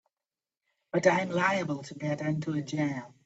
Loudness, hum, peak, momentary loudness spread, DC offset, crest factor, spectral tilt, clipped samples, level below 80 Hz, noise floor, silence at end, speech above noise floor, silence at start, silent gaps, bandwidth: -30 LUFS; none; -10 dBFS; 9 LU; under 0.1%; 22 dB; -6 dB/octave; under 0.1%; -72 dBFS; under -90 dBFS; 0.15 s; over 61 dB; 0.95 s; none; 8 kHz